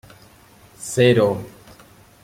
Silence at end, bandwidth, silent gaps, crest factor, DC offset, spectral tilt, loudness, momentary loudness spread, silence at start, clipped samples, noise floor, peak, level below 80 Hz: 0.75 s; 16.5 kHz; none; 20 dB; under 0.1%; -5.5 dB/octave; -18 LUFS; 20 LU; 0.8 s; under 0.1%; -49 dBFS; -2 dBFS; -56 dBFS